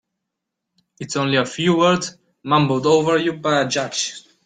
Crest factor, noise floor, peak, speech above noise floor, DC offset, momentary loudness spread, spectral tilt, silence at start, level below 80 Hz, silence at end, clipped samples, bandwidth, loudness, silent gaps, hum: 16 dB; -80 dBFS; -4 dBFS; 62 dB; under 0.1%; 10 LU; -4.5 dB/octave; 1 s; -60 dBFS; 0.25 s; under 0.1%; 9.6 kHz; -19 LUFS; none; none